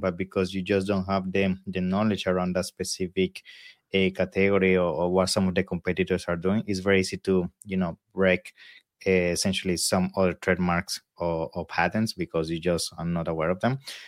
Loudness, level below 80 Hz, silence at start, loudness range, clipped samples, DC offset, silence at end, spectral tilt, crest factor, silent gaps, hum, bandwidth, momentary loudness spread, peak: -26 LUFS; -54 dBFS; 0 s; 3 LU; under 0.1%; under 0.1%; 0 s; -5 dB/octave; 18 dB; none; none; 15.5 kHz; 6 LU; -8 dBFS